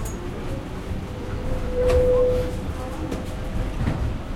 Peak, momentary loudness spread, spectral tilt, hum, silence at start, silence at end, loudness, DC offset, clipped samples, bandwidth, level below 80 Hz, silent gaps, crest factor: -8 dBFS; 12 LU; -7 dB/octave; none; 0 s; 0 s; -26 LUFS; under 0.1%; under 0.1%; 16 kHz; -30 dBFS; none; 16 dB